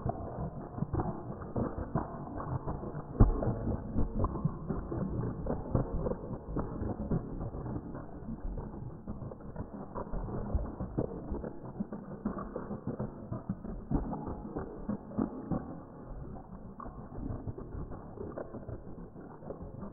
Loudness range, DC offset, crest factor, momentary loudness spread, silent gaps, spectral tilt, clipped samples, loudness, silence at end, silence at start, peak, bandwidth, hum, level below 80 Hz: 8 LU; under 0.1%; 28 dB; 11 LU; none; -8.5 dB/octave; under 0.1%; -38 LUFS; 0 s; 0 s; -8 dBFS; 2 kHz; none; -42 dBFS